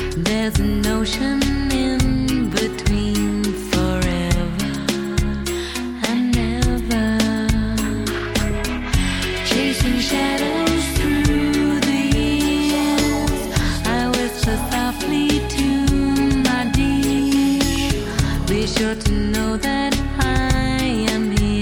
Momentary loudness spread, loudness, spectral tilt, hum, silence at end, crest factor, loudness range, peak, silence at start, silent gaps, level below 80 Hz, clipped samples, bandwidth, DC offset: 4 LU; -19 LUFS; -5 dB/octave; none; 0 s; 14 dB; 2 LU; -4 dBFS; 0 s; none; -26 dBFS; under 0.1%; 17.5 kHz; under 0.1%